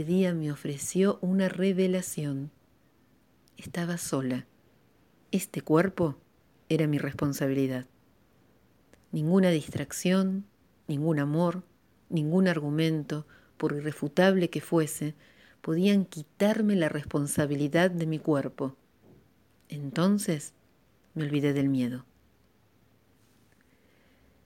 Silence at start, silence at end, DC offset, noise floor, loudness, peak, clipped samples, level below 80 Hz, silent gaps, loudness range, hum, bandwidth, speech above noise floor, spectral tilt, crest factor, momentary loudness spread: 0 s; 2.45 s; under 0.1%; -65 dBFS; -28 LUFS; -8 dBFS; under 0.1%; -66 dBFS; none; 5 LU; none; 17 kHz; 38 dB; -6 dB/octave; 20 dB; 12 LU